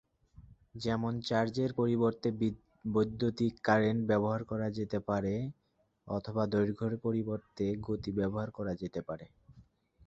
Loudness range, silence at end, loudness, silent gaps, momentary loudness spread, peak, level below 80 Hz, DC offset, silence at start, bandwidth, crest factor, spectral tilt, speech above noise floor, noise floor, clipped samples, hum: 4 LU; 0.45 s; -34 LUFS; none; 10 LU; -12 dBFS; -60 dBFS; under 0.1%; 0.4 s; 7.8 kHz; 22 dB; -7.5 dB/octave; 30 dB; -62 dBFS; under 0.1%; none